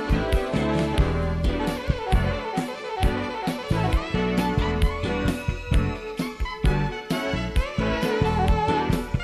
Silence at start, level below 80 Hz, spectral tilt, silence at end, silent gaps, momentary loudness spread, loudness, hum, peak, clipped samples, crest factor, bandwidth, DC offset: 0 s; -28 dBFS; -6.5 dB/octave; 0 s; none; 6 LU; -25 LUFS; none; -6 dBFS; under 0.1%; 16 dB; 14 kHz; under 0.1%